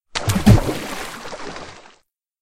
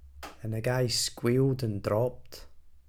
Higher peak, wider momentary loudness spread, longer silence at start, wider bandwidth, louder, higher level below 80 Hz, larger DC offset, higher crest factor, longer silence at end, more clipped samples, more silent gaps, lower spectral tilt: first, 0 dBFS vs -14 dBFS; about the same, 20 LU vs 21 LU; first, 0.15 s vs 0 s; second, 16 kHz vs 18.5 kHz; first, -18 LUFS vs -29 LUFS; first, -30 dBFS vs -52 dBFS; neither; about the same, 20 dB vs 18 dB; first, 0.6 s vs 0.1 s; neither; neither; about the same, -6 dB/octave vs -5 dB/octave